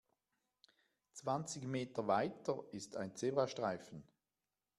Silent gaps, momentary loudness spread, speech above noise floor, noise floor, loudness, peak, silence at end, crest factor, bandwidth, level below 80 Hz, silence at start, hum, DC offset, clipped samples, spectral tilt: none; 11 LU; over 50 dB; under -90 dBFS; -41 LUFS; -20 dBFS; 0.75 s; 22 dB; 13.5 kHz; -82 dBFS; 1.15 s; none; under 0.1%; under 0.1%; -5 dB/octave